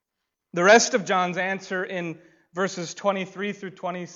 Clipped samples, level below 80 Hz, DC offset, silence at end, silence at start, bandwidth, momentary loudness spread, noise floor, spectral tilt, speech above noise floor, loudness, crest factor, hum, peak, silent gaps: under 0.1%; -72 dBFS; under 0.1%; 0 s; 0.55 s; 8 kHz; 17 LU; -83 dBFS; -3.5 dB/octave; 59 dB; -24 LUFS; 20 dB; none; -4 dBFS; none